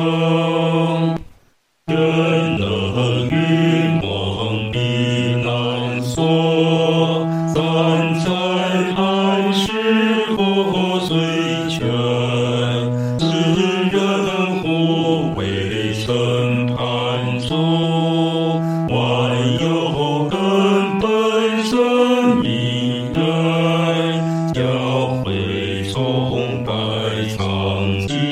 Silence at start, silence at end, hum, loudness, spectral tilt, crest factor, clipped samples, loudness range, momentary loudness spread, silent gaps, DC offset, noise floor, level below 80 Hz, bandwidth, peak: 0 s; 0 s; none; -18 LUFS; -6.5 dB/octave; 14 dB; under 0.1%; 2 LU; 5 LU; none; under 0.1%; -58 dBFS; -48 dBFS; 12.5 kHz; -4 dBFS